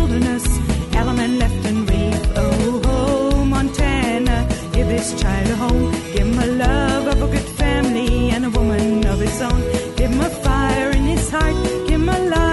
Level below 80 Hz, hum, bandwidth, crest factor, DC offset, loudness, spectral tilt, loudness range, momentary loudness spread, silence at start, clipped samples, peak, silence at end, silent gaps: -22 dBFS; none; 12 kHz; 12 dB; under 0.1%; -18 LUFS; -5.5 dB/octave; 1 LU; 3 LU; 0 s; under 0.1%; -6 dBFS; 0 s; none